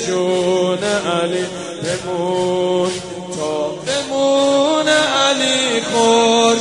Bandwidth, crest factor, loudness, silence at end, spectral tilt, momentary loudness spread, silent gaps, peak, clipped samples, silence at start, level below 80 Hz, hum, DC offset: 11 kHz; 16 dB; -16 LUFS; 0 s; -3 dB/octave; 10 LU; none; 0 dBFS; under 0.1%; 0 s; -58 dBFS; none; 0.1%